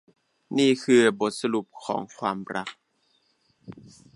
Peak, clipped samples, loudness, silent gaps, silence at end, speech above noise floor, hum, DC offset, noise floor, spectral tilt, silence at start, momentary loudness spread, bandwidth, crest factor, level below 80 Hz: -6 dBFS; under 0.1%; -25 LUFS; none; 0.4 s; 44 dB; none; under 0.1%; -69 dBFS; -4.5 dB/octave; 0.5 s; 17 LU; 11.5 kHz; 20 dB; -70 dBFS